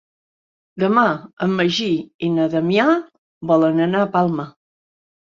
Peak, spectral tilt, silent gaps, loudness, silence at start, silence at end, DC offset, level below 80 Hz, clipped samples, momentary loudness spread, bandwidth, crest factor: -2 dBFS; -6.5 dB/octave; 1.33-1.37 s, 2.14-2.19 s, 3.18-3.41 s; -18 LUFS; 0.75 s; 0.7 s; under 0.1%; -62 dBFS; under 0.1%; 7 LU; 7.6 kHz; 18 dB